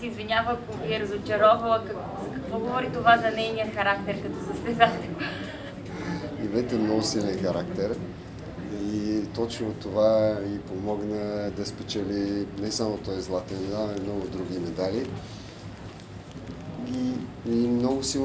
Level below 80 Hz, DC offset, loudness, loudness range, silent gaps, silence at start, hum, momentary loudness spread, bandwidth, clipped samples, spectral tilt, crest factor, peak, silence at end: -50 dBFS; under 0.1%; -27 LUFS; 7 LU; none; 0 s; none; 16 LU; 8 kHz; under 0.1%; -5 dB/octave; 24 dB; -4 dBFS; 0 s